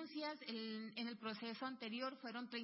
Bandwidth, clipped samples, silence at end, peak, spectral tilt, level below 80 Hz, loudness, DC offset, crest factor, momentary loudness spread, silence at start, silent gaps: 5.6 kHz; under 0.1%; 0 s; -32 dBFS; -2 dB/octave; under -90 dBFS; -47 LUFS; under 0.1%; 16 dB; 2 LU; 0 s; none